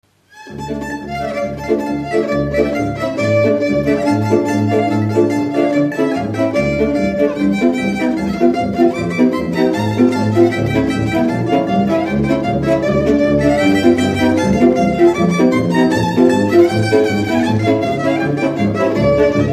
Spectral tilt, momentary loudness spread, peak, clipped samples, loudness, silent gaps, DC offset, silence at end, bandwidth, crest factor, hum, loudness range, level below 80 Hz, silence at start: -7 dB/octave; 6 LU; 0 dBFS; under 0.1%; -15 LUFS; none; under 0.1%; 0 s; 15 kHz; 14 dB; none; 3 LU; -38 dBFS; 0.35 s